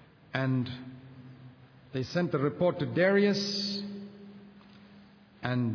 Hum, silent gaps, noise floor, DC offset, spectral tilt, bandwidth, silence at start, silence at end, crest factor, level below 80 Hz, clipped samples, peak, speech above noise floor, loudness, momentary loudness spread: none; none; -55 dBFS; under 0.1%; -6 dB/octave; 5.4 kHz; 0.35 s; 0 s; 20 dB; -68 dBFS; under 0.1%; -12 dBFS; 27 dB; -30 LUFS; 24 LU